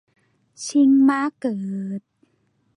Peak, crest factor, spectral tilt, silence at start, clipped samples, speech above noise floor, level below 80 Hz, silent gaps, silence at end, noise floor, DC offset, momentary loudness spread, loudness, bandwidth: -8 dBFS; 14 dB; -5.5 dB/octave; 0.6 s; under 0.1%; 47 dB; -74 dBFS; none; 0.8 s; -66 dBFS; under 0.1%; 17 LU; -20 LUFS; 11 kHz